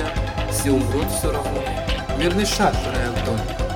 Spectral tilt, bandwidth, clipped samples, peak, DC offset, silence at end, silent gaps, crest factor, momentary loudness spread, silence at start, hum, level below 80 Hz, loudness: -4.5 dB/octave; 17 kHz; under 0.1%; -6 dBFS; under 0.1%; 0 s; none; 16 dB; 6 LU; 0 s; none; -28 dBFS; -22 LUFS